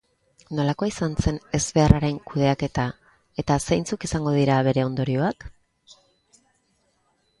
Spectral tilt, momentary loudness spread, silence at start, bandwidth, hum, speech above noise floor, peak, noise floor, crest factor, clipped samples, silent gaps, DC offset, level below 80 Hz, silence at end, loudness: -6 dB/octave; 9 LU; 0.5 s; 11.5 kHz; none; 46 dB; 0 dBFS; -68 dBFS; 24 dB; under 0.1%; none; under 0.1%; -38 dBFS; 1.9 s; -23 LUFS